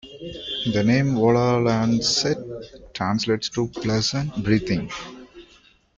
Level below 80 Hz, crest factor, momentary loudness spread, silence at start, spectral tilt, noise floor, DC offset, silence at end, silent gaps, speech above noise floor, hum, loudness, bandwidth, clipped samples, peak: -48 dBFS; 16 dB; 16 LU; 0.05 s; -5 dB/octave; -55 dBFS; under 0.1%; 0.55 s; none; 33 dB; none; -22 LUFS; 8.6 kHz; under 0.1%; -6 dBFS